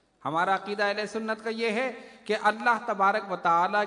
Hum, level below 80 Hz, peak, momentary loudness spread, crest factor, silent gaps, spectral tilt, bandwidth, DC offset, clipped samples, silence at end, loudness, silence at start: none; -76 dBFS; -8 dBFS; 7 LU; 18 dB; none; -4.5 dB/octave; 11 kHz; under 0.1%; under 0.1%; 0 s; -27 LUFS; 0.25 s